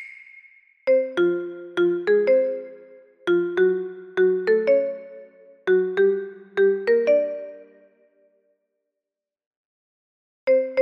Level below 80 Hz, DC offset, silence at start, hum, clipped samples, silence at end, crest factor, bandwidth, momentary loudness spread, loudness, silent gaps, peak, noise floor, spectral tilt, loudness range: -74 dBFS; under 0.1%; 0 s; none; under 0.1%; 0 s; 14 dB; 6.2 kHz; 12 LU; -22 LUFS; 9.46-10.47 s; -8 dBFS; -87 dBFS; -7 dB/octave; 6 LU